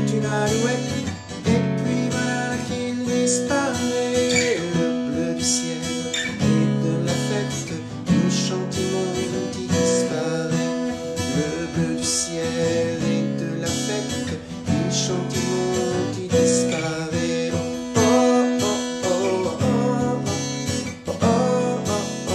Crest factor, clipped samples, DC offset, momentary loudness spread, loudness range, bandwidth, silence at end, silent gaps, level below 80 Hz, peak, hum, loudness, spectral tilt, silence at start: 18 dB; under 0.1%; under 0.1%; 7 LU; 3 LU; 14 kHz; 0 s; none; -54 dBFS; -4 dBFS; none; -22 LUFS; -4.5 dB/octave; 0 s